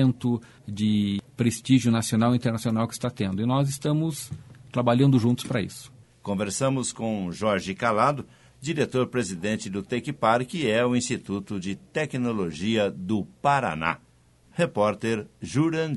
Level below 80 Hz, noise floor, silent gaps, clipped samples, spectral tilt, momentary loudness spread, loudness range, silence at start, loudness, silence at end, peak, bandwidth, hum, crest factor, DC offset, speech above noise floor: -58 dBFS; -58 dBFS; none; under 0.1%; -6 dB/octave; 10 LU; 2 LU; 0 s; -26 LUFS; 0 s; -6 dBFS; 11.5 kHz; none; 20 dB; under 0.1%; 33 dB